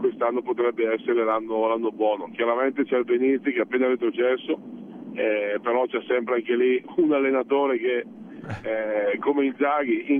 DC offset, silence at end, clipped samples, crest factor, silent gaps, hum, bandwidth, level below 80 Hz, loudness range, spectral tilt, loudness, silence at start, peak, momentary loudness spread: under 0.1%; 0 s; under 0.1%; 14 dB; none; none; 3.7 kHz; -68 dBFS; 1 LU; -8 dB/octave; -24 LUFS; 0 s; -10 dBFS; 7 LU